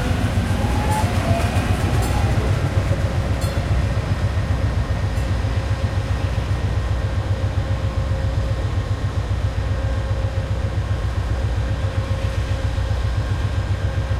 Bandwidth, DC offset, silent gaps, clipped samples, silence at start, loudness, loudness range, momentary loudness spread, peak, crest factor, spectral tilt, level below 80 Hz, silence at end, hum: 14 kHz; under 0.1%; none; under 0.1%; 0 s; -22 LUFS; 3 LU; 3 LU; -4 dBFS; 16 dB; -6.5 dB/octave; -26 dBFS; 0 s; none